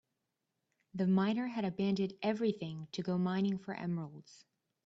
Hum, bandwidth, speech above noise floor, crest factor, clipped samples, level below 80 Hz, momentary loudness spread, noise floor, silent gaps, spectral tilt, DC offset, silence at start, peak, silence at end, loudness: none; 7.6 kHz; 51 dB; 16 dB; under 0.1%; -76 dBFS; 10 LU; -86 dBFS; none; -7.5 dB/octave; under 0.1%; 0.95 s; -20 dBFS; 0.5 s; -35 LUFS